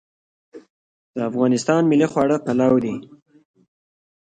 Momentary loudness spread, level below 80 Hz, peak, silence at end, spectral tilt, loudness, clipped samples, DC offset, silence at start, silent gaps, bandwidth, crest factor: 11 LU; -62 dBFS; -4 dBFS; 1.35 s; -6.5 dB/octave; -19 LUFS; under 0.1%; under 0.1%; 0.55 s; 0.70-1.14 s; 9.2 kHz; 18 dB